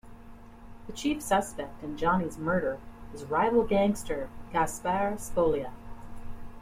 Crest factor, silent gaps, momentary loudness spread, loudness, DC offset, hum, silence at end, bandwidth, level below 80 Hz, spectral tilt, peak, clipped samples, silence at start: 16 dB; none; 22 LU; -29 LUFS; under 0.1%; none; 0 s; 16 kHz; -46 dBFS; -5.5 dB/octave; -14 dBFS; under 0.1%; 0.05 s